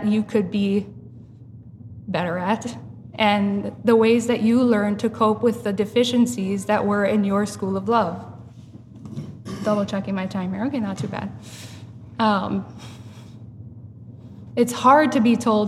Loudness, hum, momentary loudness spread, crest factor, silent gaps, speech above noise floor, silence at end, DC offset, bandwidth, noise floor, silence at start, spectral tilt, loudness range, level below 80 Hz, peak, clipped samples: -21 LUFS; none; 23 LU; 18 dB; none; 22 dB; 0 s; under 0.1%; 13.5 kHz; -42 dBFS; 0 s; -6 dB/octave; 8 LU; -58 dBFS; -4 dBFS; under 0.1%